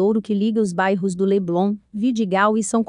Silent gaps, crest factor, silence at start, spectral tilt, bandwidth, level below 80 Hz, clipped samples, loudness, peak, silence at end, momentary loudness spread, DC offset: none; 16 dB; 0 s; -6 dB/octave; 11 kHz; -62 dBFS; under 0.1%; -20 LUFS; -4 dBFS; 0.05 s; 4 LU; under 0.1%